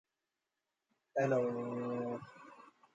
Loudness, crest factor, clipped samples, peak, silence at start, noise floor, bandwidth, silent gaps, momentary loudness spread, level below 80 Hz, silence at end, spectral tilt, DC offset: -37 LUFS; 20 dB; under 0.1%; -20 dBFS; 1.15 s; -89 dBFS; 7.8 kHz; none; 22 LU; -84 dBFS; 0.3 s; -8 dB/octave; under 0.1%